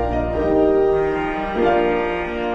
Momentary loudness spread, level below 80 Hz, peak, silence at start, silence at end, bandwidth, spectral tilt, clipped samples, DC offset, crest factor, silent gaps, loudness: 6 LU; -34 dBFS; -6 dBFS; 0 s; 0 s; 7.4 kHz; -8 dB/octave; under 0.1%; under 0.1%; 12 dB; none; -19 LUFS